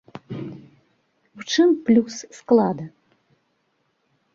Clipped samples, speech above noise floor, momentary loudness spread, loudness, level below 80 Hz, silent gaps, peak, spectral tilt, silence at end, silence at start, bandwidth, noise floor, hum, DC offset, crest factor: under 0.1%; 50 dB; 19 LU; -20 LUFS; -66 dBFS; none; -4 dBFS; -5.5 dB/octave; 1.45 s; 0.15 s; 7.6 kHz; -70 dBFS; none; under 0.1%; 20 dB